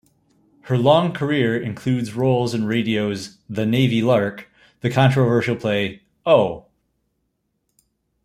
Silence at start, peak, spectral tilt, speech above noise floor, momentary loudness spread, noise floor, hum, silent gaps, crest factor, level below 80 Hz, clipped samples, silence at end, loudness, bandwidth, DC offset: 0.65 s; -2 dBFS; -7 dB/octave; 54 dB; 11 LU; -72 dBFS; none; none; 18 dB; -58 dBFS; under 0.1%; 1.65 s; -20 LUFS; 13.5 kHz; under 0.1%